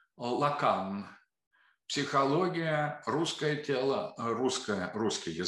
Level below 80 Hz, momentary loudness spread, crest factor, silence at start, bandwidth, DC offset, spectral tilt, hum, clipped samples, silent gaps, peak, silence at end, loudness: -76 dBFS; 7 LU; 18 dB; 0.2 s; 12 kHz; under 0.1%; -4.5 dB/octave; none; under 0.1%; 1.47-1.51 s; -14 dBFS; 0 s; -31 LUFS